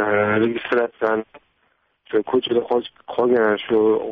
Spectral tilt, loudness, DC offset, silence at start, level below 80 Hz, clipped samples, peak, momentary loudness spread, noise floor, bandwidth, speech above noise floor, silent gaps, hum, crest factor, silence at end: -3.5 dB/octave; -20 LUFS; under 0.1%; 0 s; -62 dBFS; under 0.1%; -6 dBFS; 6 LU; -66 dBFS; 4.9 kHz; 46 dB; none; none; 14 dB; 0 s